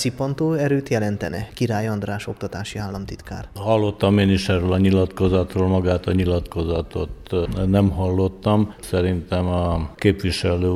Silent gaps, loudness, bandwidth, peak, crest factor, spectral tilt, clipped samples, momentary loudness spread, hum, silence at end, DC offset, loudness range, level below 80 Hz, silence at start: none; -21 LUFS; 13.5 kHz; -2 dBFS; 18 dB; -7 dB/octave; under 0.1%; 10 LU; none; 0 s; under 0.1%; 5 LU; -38 dBFS; 0 s